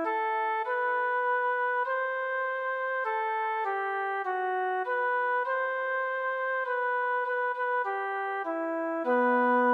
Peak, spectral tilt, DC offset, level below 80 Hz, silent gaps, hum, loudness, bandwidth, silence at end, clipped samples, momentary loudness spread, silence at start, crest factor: -16 dBFS; -4.5 dB/octave; under 0.1%; under -90 dBFS; none; none; -29 LUFS; 5 kHz; 0 s; under 0.1%; 4 LU; 0 s; 12 dB